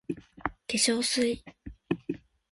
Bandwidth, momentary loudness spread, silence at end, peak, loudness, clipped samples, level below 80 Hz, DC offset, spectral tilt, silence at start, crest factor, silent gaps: 12 kHz; 16 LU; 0.35 s; -12 dBFS; -30 LUFS; under 0.1%; -56 dBFS; under 0.1%; -2.5 dB/octave; 0.1 s; 20 dB; none